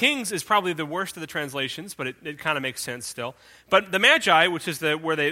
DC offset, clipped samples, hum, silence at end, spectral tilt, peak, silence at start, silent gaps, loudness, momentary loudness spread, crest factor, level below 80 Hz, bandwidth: under 0.1%; under 0.1%; none; 0 s; -3 dB/octave; -2 dBFS; 0 s; none; -23 LUFS; 15 LU; 22 dB; -66 dBFS; 16.5 kHz